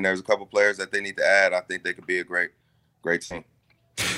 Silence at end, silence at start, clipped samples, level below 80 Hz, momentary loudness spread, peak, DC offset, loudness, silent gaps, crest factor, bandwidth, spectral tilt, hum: 0 s; 0 s; under 0.1%; -64 dBFS; 14 LU; -6 dBFS; under 0.1%; -24 LUFS; none; 20 dB; 16 kHz; -3 dB/octave; none